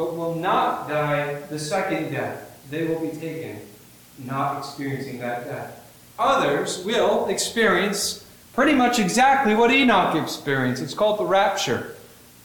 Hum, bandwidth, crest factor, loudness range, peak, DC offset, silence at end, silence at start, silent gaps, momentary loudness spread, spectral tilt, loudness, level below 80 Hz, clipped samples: 60 Hz at -50 dBFS; 19 kHz; 16 dB; 10 LU; -6 dBFS; under 0.1%; 0.4 s; 0 s; none; 16 LU; -4 dB/octave; -22 LUFS; -56 dBFS; under 0.1%